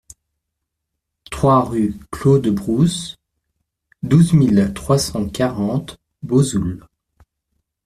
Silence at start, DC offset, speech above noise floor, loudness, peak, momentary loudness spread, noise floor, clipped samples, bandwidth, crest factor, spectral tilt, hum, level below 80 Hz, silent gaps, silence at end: 1.3 s; under 0.1%; 62 dB; -17 LUFS; -2 dBFS; 17 LU; -78 dBFS; under 0.1%; 14.5 kHz; 16 dB; -6.5 dB/octave; none; -44 dBFS; none; 1.1 s